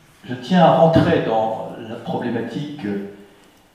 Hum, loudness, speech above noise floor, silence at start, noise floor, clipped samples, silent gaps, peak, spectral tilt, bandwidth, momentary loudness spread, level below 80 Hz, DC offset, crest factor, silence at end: none; -18 LUFS; 32 dB; 0.25 s; -50 dBFS; under 0.1%; none; -2 dBFS; -8 dB/octave; 10 kHz; 18 LU; -50 dBFS; under 0.1%; 18 dB; 0.5 s